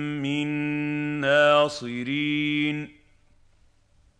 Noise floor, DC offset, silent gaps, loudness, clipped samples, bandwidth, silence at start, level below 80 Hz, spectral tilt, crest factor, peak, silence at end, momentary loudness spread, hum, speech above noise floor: -60 dBFS; under 0.1%; none; -24 LUFS; under 0.1%; 10 kHz; 0 s; -62 dBFS; -5.5 dB/octave; 18 dB; -8 dBFS; 1.3 s; 11 LU; none; 33 dB